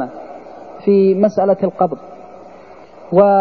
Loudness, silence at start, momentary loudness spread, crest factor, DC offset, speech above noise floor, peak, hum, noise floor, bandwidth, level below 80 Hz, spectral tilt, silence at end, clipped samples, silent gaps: -15 LUFS; 0 s; 23 LU; 16 dB; 0.4%; 27 dB; -2 dBFS; none; -39 dBFS; 6.2 kHz; -60 dBFS; -9.5 dB/octave; 0 s; under 0.1%; none